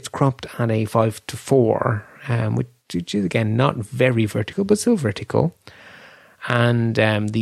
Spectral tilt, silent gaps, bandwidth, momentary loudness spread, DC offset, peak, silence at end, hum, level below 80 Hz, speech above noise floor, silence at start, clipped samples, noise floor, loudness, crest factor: -6.5 dB/octave; none; 13.5 kHz; 8 LU; under 0.1%; -2 dBFS; 0 s; none; -54 dBFS; 27 dB; 0.05 s; under 0.1%; -46 dBFS; -21 LUFS; 20 dB